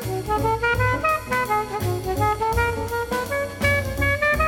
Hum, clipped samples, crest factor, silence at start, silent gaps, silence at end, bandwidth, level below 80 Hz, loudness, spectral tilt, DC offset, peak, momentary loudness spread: none; under 0.1%; 16 dB; 0 s; none; 0 s; 18.5 kHz; -34 dBFS; -22 LUFS; -5 dB/octave; under 0.1%; -6 dBFS; 5 LU